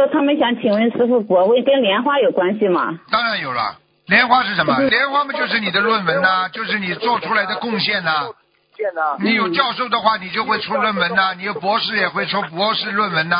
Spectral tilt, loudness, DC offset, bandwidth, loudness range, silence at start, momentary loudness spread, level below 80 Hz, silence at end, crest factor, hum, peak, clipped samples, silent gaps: -9 dB/octave; -17 LUFS; under 0.1%; 5.2 kHz; 3 LU; 0 s; 6 LU; -62 dBFS; 0 s; 18 dB; none; 0 dBFS; under 0.1%; none